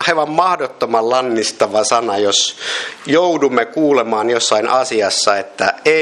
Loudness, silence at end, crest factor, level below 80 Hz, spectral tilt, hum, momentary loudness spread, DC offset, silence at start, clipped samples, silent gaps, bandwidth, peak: -15 LUFS; 0 s; 14 dB; -64 dBFS; -2.5 dB/octave; none; 4 LU; under 0.1%; 0 s; under 0.1%; none; 12 kHz; 0 dBFS